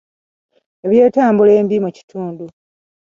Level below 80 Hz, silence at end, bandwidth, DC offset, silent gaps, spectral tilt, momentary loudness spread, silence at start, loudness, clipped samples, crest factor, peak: -60 dBFS; 0.55 s; 7.2 kHz; under 0.1%; 2.03-2.08 s; -8.5 dB/octave; 17 LU; 0.85 s; -13 LUFS; under 0.1%; 14 dB; 0 dBFS